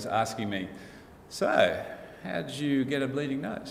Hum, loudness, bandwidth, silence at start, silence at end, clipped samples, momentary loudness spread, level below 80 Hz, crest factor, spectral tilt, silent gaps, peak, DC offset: none; -29 LUFS; 16 kHz; 0 s; 0 s; under 0.1%; 17 LU; -62 dBFS; 22 dB; -5 dB/octave; none; -8 dBFS; under 0.1%